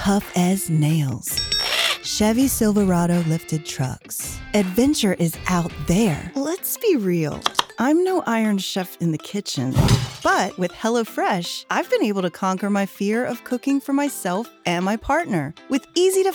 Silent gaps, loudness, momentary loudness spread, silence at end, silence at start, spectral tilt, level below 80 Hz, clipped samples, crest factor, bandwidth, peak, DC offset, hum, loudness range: none; -21 LUFS; 7 LU; 0 s; 0 s; -5 dB/octave; -42 dBFS; under 0.1%; 20 dB; over 20 kHz; -2 dBFS; under 0.1%; none; 3 LU